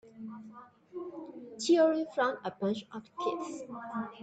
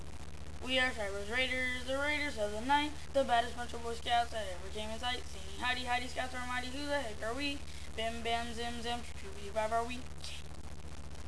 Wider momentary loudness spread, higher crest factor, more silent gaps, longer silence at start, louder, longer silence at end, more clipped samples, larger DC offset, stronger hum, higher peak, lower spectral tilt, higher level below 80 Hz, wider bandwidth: first, 21 LU vs 14 LU; about the same, 18 dB vs 18 dB; neither; about the same, 0.05 s vs 0 s; first, -32 LUFS vs -36 LUFS; about the same, 0 s vs 0 s; neither; second, under 0.1% vs 0.8%; neither; about the same, -16 dBFS vs -18 dBFS; about the same, -4.5 dB/octave vs -3.5 dB/octave; second, -80 dBFS vs -50 dBFS; second, 9 kHz vs 11 kHz